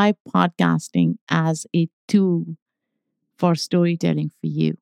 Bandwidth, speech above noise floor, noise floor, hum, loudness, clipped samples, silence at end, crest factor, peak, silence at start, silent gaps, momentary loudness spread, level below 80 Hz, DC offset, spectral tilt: 11.5 kHz; 58 dB; -78 dBFS; none; -21 LUFS; under 0.1%; 0.05 s; 18 dB; -2 dBFS; 0 s; 0.20-0.25 s, 1.21-1.27 s, 1.93-2.08 s, 2.62-2.66 s; 6 LU; -70 dBFS; under 0.1%; -6.5 dB/octave